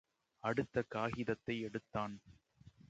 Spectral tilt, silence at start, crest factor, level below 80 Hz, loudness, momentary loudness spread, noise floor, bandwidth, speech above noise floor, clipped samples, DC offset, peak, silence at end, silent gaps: -7 dB/octave; 0.45 s; 20 dB; -68 dBFS; -41 LUFS; 6 LU; -64 dBFS; 8.8 kHz; 24 dB; under 0.1%; under 0.1%; -22 dBFS; 0.05 s; none